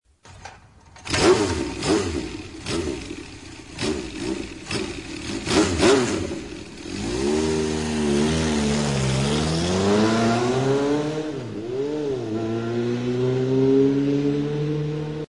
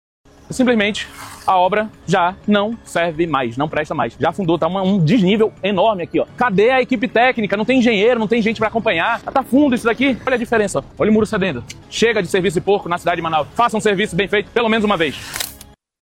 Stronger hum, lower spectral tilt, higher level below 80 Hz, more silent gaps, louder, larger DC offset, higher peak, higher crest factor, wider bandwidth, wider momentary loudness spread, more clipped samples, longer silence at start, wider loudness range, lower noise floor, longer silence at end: neither; about the same, -5 dB/octave vs -5.5 dB/octave; about the same, -42 dBFS vs -46 dBFS; neither; second, -23 LUFS vs -17 LUFS; first, 0.1% vs under 0.1%; second, -6 dBFS vs -2 dBFS; about the same, 18 dB vs 14 dB; second, 11 kHz vs 16 kHz; first, 15 LU vs 7 LU; neither; second, 0.25 s vs 0.5 s; first, 6 LU vs 3 LU; first, -48 dBFS vs -43 dBFS; second, 0.05 s vs 0.45 s